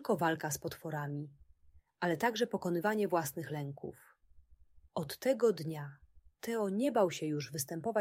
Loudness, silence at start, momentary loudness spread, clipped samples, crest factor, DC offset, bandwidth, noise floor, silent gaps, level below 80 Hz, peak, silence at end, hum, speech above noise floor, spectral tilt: -35 LUFS; 0 s; 13 LU; under 0.1%; 18 dB; under 0.1%; 16 kHz; -65 dBFS; none; -70 dBFS; -18 dBFS; 0 s; none; 30 dB; -5 dB/octave